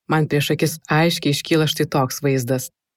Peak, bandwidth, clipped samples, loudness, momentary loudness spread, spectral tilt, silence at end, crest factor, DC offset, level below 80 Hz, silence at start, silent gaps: -6 dBFS; 16.5 kHz; under 0.1%; -19 LUFS; 4 LU; -5 dB/octave; 0.3 s; 14 dB; under 0.1%; -58 dBFS; 0.1 s; none